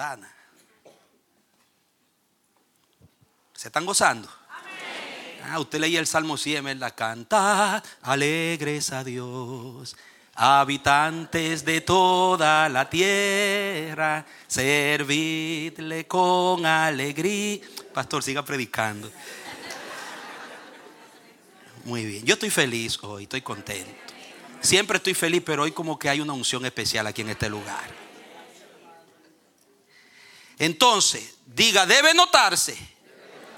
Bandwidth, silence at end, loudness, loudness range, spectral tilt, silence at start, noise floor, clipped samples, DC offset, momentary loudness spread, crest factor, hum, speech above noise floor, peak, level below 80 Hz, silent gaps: 18 kHz; 0 s; -22 LUFS; 11 LU; -2.5 dB/octave; 0 s; -68 dBFS; under 0.1%; under 0.1%; 19 LU; 24 dB; none; 45 dB; -2 dBFS; -62 dBFS; none